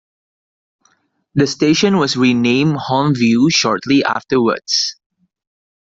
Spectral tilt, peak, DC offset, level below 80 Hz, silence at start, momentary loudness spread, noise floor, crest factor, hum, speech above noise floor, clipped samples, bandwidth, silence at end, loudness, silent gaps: -4.5 dB/octave; -2 dBFS; under 0.1%; -54 dBFS; 1.35 s; 4 LU; -60 dBFS; 14 dB; none; 46 dB; under 0.1%; 7.8 kHz; 0.9 s; -15 LUFS; none